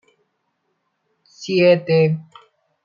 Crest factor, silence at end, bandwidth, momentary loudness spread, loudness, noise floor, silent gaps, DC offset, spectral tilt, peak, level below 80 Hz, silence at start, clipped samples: 18 dB; 0.6 s; 7.4 kHz; 13 LU; -17 LUFS; -71 dBFS; none; under 0.1%; -7 dB/octave; -4 dBFS; -66 dBFS; 1.4 s; under 0.1%